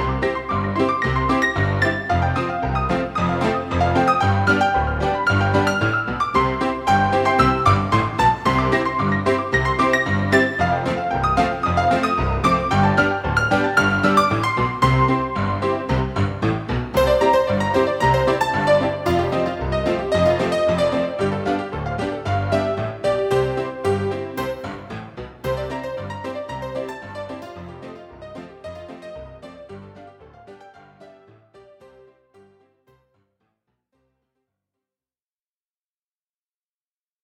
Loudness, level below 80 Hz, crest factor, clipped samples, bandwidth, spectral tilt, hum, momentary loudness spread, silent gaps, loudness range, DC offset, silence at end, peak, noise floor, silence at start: -20 LUFS; -36 dBFS; 18 dB; under 0.1%; 16 kHz; -6.5 dB/octave; none; 16 LU; none; 14 LU; under 0.1%; 6.2 s; -2 dBFS; under -90 dBFS; 0 s